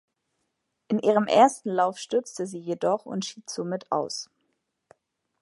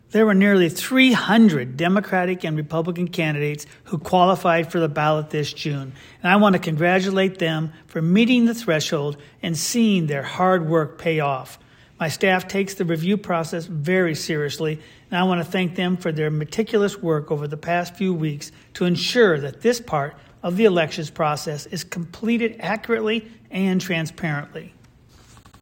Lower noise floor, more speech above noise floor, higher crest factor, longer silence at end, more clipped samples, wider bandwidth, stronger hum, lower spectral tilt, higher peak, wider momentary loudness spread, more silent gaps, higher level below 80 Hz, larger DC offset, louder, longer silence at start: first, -78 dBFS vs -51 dBFS; first, 53 dB vs 30 dB; about the same, 22 dB vs 18 dB; first, 1.15 s vs 0.95 s; neither; second, 11.5 kHz vs 16.5 kHz; neither; about the same, -4.5 dB/octave vs -5.5 dB/octave; about the same, -4 dBFS vs -2 dBFS; about the same, 14 LU vs 12 LU; neither; second, -80 dBFS vs -60 dBFS; neither; second, -26 LUFS vs -21 LUFS; first, 0.9 s vs 0.15 s